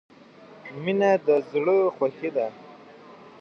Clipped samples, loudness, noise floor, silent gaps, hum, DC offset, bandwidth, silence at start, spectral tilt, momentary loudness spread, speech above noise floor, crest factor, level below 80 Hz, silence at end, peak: under 0.1%; -24 LUFS; -49 dBFS; none; none; under 0.1%; 6.8 kHz; 0.5 s; -7 dB/octave; 11 LU; 26 dB; 16 dB; -78 dBFS; 0.3 s; -10 dBFS